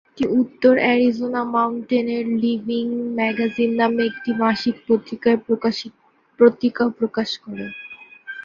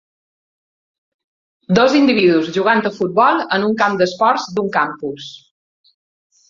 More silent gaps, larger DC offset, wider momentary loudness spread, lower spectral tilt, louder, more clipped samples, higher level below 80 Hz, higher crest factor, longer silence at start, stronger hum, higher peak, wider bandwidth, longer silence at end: neither; neither; first, 14 LU vs 10 LU; about the same, -6 dB/octave vs -5.5 dB/octave; second, -20 LUFS vs -15 LUFS; neither; about the same, -62 dBFS vs -60 dBFS; about the same, 18 dB vs 16 dB; second, 0.15 s vs 1.7 s; neither; about the same, -2 dBFS vs -2 dBFS; about the same, 7.2 kHz vs 7.6 kHz; second, 0.05 s vs 1.1 s